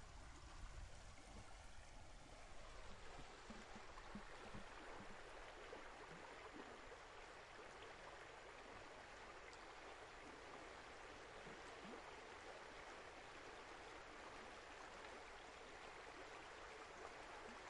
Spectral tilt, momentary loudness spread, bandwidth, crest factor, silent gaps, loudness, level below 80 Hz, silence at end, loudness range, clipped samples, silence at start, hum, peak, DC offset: -3.5 dB/octave; 4 LU; 11 kHz; 18 dB; none; -58 LUFS; -66 dBFS; 0 s; 3 LU; under 0.1%; 0 s; none; -40 dBFS; under 0.1%